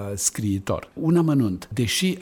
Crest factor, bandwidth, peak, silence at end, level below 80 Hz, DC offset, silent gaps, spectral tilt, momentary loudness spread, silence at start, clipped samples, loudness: 16 dB; 18.5 kHz; -8 dBFS; 0 s; -50 dBFS; under 0.1%; none; -4.5 dB/octave; 7 LU; 0 s; under 0.1%; -23 LUFS